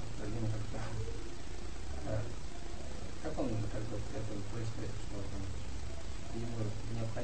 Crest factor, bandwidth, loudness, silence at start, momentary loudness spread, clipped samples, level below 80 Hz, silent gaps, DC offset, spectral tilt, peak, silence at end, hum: 16 dB; 9 kHz; -42 LUFS; 0 s; 7 LU; under 0.1%; -46 dBFS; none; 2%; -6 dB/octave; -22 dBFS; 0 s; none